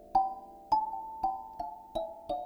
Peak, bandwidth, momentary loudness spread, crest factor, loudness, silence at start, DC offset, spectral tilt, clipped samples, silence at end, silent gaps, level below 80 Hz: -16 dBFS; over 20 kHz; 11 LU; 18 dB; -35 LUFS; 0 s; under 0.1%; -6 dB/octave; under 0.1%; 0 s; none; -58 dBFS